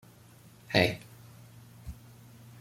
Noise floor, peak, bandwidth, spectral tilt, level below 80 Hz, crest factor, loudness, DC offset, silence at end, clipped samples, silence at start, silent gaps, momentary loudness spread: -55 dBFS; -6 dBFS; 16.5 kHz; -5 dB/octave; -58 dBFS; 28 dB; -29 LUFS; under 0.1%; 0.7 s; under 0.1%; 0.7 s; none; 26 LU